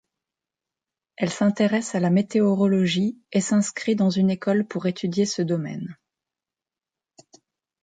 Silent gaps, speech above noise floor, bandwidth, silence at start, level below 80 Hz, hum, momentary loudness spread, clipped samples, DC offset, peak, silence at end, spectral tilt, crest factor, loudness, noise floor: none; 68 dB; 9.4 kHz; 1.2 s; -66 dBFS; none; 7 LU; under 0.1%; under 0.1%; -8 dBFS; 1.9 s; -6 dB/octave; 16 dB; -23 LUFS; -90 dBFS